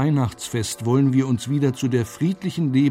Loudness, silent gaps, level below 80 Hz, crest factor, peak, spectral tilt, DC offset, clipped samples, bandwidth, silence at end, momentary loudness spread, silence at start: -22 LUFS; none; -56 dBFS; 14 dB; -8 dBFS; -6.5 dB/octave; under 0.1%; under 0.1%; 16 kHz; 0 s; 6 LU; 0 s